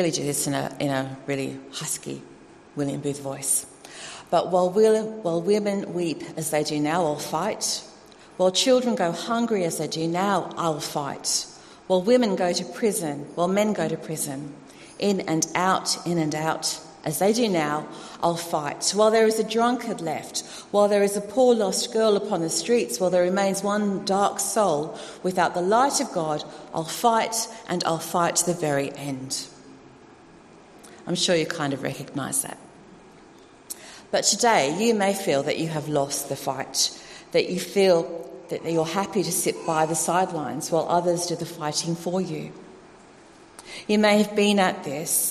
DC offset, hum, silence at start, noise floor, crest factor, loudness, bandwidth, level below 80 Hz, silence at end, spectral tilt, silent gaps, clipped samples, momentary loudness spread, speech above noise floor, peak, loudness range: under 0.1%; none; 0 s; -50 dBFS; 18 dB; -24 LUFS; 13 kHz; -64 dBFS; 0 s; -3.5 dB/octave; none; under 0.1%; 11 LU; 26 dB; -6 dBFS; 5 LU